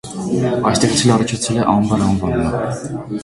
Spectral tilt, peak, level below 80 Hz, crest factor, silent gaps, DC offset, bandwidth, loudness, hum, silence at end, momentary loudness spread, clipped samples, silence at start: -5 dB/octave; 0 dBFS; -38 dBFS; 16 dB; none; under 0.1%; 11.5 kHz; -17 LUFS; none; 0 s; 8 LU; under 0.1%; 0.05 s